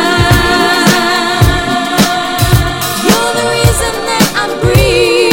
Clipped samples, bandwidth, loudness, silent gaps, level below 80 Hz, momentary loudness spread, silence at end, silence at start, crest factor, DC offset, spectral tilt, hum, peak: 0.5%; 17.5 kHz; -10 LUFS; none; -22 dBFS; 4 LU; 0 s; 0 s; 10 dB; under 0.1%; -4 dB/octave; none; 0 dBFS